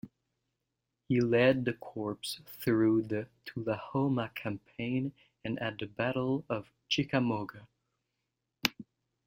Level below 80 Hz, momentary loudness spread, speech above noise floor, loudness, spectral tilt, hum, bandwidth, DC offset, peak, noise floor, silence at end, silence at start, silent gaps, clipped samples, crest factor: -66 dBFS; 12 LU; 53 dB; -32 LUFS; -6 dB/octave; none; 16.5 kHz; under 0.1%; -4 dBFS; -85 dBFS; 0.45 s; 0.05 s; none; under 0.1%; 28 dB